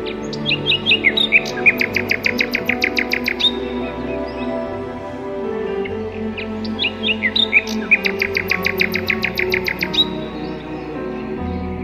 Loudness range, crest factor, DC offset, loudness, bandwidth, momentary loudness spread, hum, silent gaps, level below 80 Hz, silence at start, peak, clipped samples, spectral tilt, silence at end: 7 LU; 18 dB; under 0.1%; -18 LUFS; 14.5 kHz; 13 LU; none; none; -42 dBFS; 0 s; -2 dBFS; under 0.1%; -4 dB/octave; 0 s